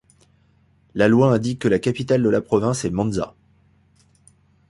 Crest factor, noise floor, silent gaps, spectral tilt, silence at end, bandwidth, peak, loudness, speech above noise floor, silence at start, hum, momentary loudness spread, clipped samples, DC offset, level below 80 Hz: 18 dB; -59 dBFS; none; -6.5 dB/octave; 1.4 s; 11.5 kHz; -4 dBFS; -20 LUFS; 40 dB; 0.95 s; none; 10 LU; under 0.1%; under 0.1%; -50 dBFS